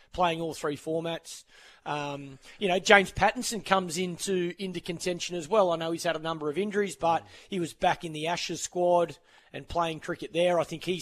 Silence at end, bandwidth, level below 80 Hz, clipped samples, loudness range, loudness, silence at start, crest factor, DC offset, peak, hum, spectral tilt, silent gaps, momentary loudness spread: 0 s; 14 kHz; -56 dBFS; under 0.1%; 3 LU; -28 LUFS; 0.15 s; 26 dB; under 0.1%; -2 dBFS; none; -4 dB/octave; none; 11 LU